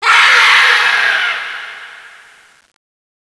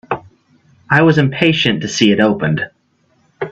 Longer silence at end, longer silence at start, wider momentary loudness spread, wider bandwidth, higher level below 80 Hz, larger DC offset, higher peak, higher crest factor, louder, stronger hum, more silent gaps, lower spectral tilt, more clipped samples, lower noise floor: first, 1.2 s vs 0 s; about the same, 0 s vs 0.1 s; first, 21 LU vs 14 LU; first, 11 kHz vs 8 kHz; second, -68 dBFS vs -50 dBFS; neither; about the same, 0 dBFS vs 0 dBFS; about the same, 14 dB vs 16 dB; first, -8 LUFS vs -14 LUFS; neither; neither; second, 2.5 dB/octave vs -5.5 dB/octave; neither; second, -42 dBFS vs -58 dBFS